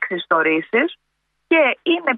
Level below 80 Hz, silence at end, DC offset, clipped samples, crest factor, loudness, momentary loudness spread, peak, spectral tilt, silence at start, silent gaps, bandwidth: -74 dBFS; 0 s; under 0.1%; under 0.1%; 16 dB; -18 LUFS; 4 LU; -2 dBFS; -7 dB/octave; 0 s; none; 4 kHz